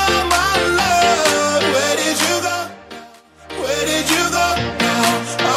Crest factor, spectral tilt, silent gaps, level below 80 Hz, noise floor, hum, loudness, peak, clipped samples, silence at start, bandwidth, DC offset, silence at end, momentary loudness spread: 16 dB; -2.5 dB/octave; none; -40 dBFS; -42 dBFS; none; -16 LUFS; 0 dBFS; under 0.1%; 0 s; 16 kHz; under 0.1%; 0 s; 12 LU